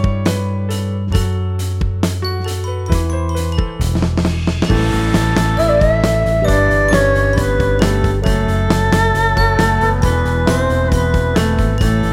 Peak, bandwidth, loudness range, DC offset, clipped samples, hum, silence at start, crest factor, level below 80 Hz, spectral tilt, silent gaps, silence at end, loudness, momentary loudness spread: 0 dBFS; 16 kHz; 5 LU; under 0.1%; under 0.1%; none; 0 s; 14 dB; -22 dBFS; -6.5 dB/octave; none; 0 s; -16 LUFS; 7 LU